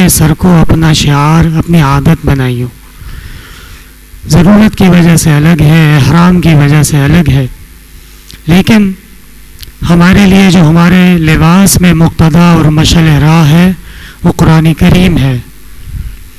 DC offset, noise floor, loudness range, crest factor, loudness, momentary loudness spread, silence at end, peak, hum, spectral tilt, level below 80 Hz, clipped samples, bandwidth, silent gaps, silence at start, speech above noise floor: under 0.1%; -32 dBFS; 5 LU; 6 dB; -5 LUFS; 11 LU; 0.1 s; 0 dBFS; none; -6 dB/octave; -20 dBFS; 3%; 15 kHz; none; 0 s; 28 dB